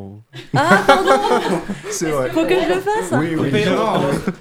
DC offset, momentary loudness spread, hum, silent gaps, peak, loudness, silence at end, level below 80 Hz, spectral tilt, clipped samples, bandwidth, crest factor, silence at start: under 0.1%; 10 LU; none; none; 0 dBFS; -17 LUFS; 0 s; -44 dBFS; -5 dB/octave; under 0.1%; 17.5 kHz; 16 dB; 0 s